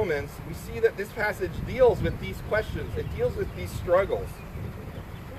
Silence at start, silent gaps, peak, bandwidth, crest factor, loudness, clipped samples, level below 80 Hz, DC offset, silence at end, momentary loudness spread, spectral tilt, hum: 0 s; none; -10 dBFS; 14.5 kHz; 18 dB; -28 LUFS; under 0.1%; -40 dBFS; under 0.1%; 0 s; 15 LU; -6.5 dB/octave; none